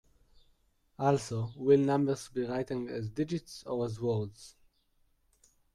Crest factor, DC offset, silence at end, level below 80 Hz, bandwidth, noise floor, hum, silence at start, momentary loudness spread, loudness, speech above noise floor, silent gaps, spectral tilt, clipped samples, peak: 20 dB; under 0.1%; 1.25 s; -64 dBFS; 12.5 kHz; -71 dBFS; none; 1 s; 11 LU; -32 LUFS; 40 dB; none; -7 dB/octave; under 0.1%; -14 dBFS